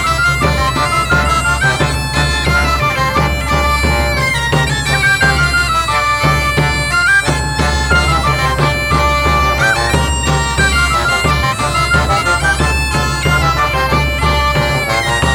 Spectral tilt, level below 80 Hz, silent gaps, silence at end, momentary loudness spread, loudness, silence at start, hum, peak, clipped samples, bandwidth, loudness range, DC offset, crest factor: -4 dB/octave; -20 dBFS; none; 0 s; 3 LU; -12 LUFS; 0 s; none; 0 dBFS; under 0.1%; 18.5 kHz; 1 LU; under 0.1%; 12 dB